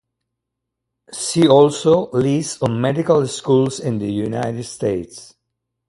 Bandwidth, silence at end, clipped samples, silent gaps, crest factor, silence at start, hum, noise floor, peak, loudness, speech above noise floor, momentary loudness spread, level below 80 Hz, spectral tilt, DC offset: 11.5 kHz; 0.65 s; under 0.1%; none; 18 dB; 1.1 s; none; -80 dBFS; 0 dBFS; -18 LUFS; 63 dB; 12 LU; -54 dBFS; -6 dB/octave; under 0.1%